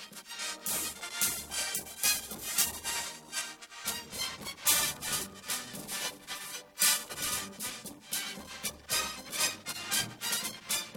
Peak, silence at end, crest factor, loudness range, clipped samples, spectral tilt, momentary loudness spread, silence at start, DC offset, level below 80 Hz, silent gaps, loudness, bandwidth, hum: -10 dBFS; 0 s; 26 dB; 3 LU; under 0.1%; 0 dB/octave; 11 LU; 0 s; under 0.1%; -64 dBFS; none; -32 LUFS; 18 kHz; none